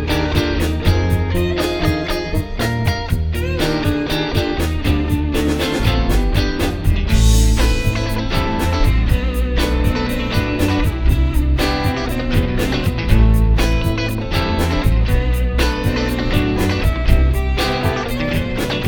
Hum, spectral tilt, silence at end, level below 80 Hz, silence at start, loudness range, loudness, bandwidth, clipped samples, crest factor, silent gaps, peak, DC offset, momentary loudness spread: none; -6 dB/octave; 0 s; -18 dBFS; 0 s; 2 LU; -18 LUFS; 18 kHz; under 0.1%; 16 dB; none; 0 dBFS; 0.1%; 4 LU